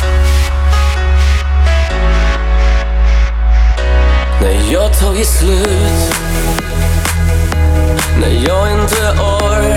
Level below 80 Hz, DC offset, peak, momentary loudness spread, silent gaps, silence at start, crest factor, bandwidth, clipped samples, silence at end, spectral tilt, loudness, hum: -12 dBFS; under 0.1%; -2 dBFS; 2 LU; none; 0 s; 8 dB; 16 kHz; under 0.1%; 0 s; -5 dB/octave; -12 LUFS; none